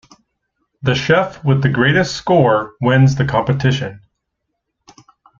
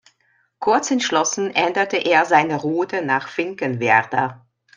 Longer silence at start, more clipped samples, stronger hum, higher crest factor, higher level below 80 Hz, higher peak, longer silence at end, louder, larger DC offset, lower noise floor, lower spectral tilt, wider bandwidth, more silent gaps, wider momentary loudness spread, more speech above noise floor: first, 0.85 s vs 0.6 s; neither; neither; about the same, 16 dB vs 18 dB; first, -46 dBFS vs -68 dBFS; about the same, 0 dBFS vs -2 dBFS; first, 1.4 s vs 0.4 s; first, -15 LUFS vs -19 LUFS; neither; first, -75 dBFS vs -63 dBFS; first, -6.5 dB/octave vs -3.5 dB/octave; second, 7.4 kHz vs 10.5 kHz; neither; about the same, 6 LU vs 7 LU; first, 60 dB vs 44 dB